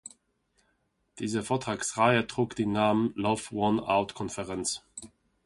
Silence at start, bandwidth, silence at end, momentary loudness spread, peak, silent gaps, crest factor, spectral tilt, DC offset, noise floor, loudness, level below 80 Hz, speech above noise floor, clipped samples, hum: 1.15 s; 11.5 kHz; 0.4 s; 13 LU; -8 dBFS; none; 22 dB; -4.5 dB/octave; under 0.1%; -74 dBFS; -29 LUFS; -60 dBFS; 46 dB; under 0.1%; none